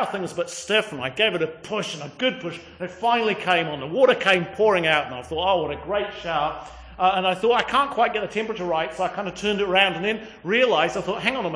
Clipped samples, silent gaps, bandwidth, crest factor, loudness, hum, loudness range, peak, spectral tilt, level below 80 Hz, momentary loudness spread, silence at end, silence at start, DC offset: under 0.1%; none; 10.5 kHz; 18 dB; -22 LUFS; none; 3 LU; -6 dBFS; -4 dB/octave; -52 dBFS; 10 LU; 0 s; 0 s; under 0.1%